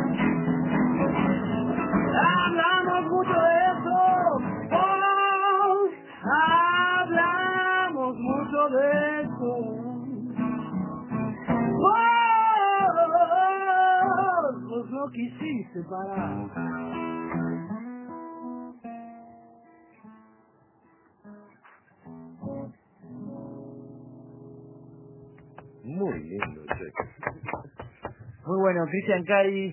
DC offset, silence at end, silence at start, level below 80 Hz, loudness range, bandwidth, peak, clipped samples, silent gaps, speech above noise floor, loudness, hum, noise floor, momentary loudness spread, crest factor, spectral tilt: under 0.1%; 0 s; 0 s; -58 dBFS; 21 LU; 3.2 kHz; -8 dBFS; under 0.1%; none; 33 dB; -24 LUFS; none; -61 dBFS; 19 LU; 18 dB; -9.5 dB/octave